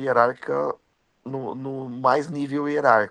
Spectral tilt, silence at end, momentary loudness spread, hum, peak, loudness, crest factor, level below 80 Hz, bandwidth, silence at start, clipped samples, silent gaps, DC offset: -7 dB/octave; 0 s; 14 LU; none; -2 dBFS; -24 LUFS; 22 dB; -72 dBFS; 10 kHz; 0 s; under 0.1%; none; under 0.1%